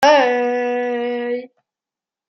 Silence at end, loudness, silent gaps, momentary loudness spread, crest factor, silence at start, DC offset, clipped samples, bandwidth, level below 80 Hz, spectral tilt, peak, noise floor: 0.85 s; -19 LUFS; none; 11 LU; 16 dB; 0 s; under 0.1%; under 0.1%; 15.5 kHz; -72 dBFS; -2.5 dB/octave; -2 dBFS; -89 dBFS